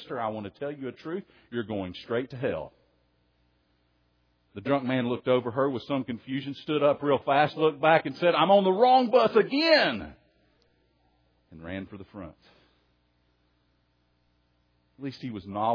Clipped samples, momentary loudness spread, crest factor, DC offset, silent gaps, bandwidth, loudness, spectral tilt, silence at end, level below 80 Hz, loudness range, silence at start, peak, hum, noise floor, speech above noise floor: under 0.1%; 19 LU; 22 dB; under 0.1%; none; 5.4 kHz; -26 LUFS; -7 dB/octave; 0 s; -66 dBFS; 23 LU; 0 s; -6 dBFS; none; -70 dBFS; 44 dB